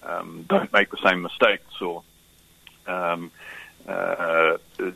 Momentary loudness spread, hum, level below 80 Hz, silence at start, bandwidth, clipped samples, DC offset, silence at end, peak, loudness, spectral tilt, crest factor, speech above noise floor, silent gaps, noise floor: 19 LU; none; -64 dBFS; 0.05 s; 13.5 kHz; under 0.1%; under 0.1%; 0 s; -2 dBFS; -23 LUFS; -5 dB/octave; 22 dB; 32 dB; none; -56 dBFS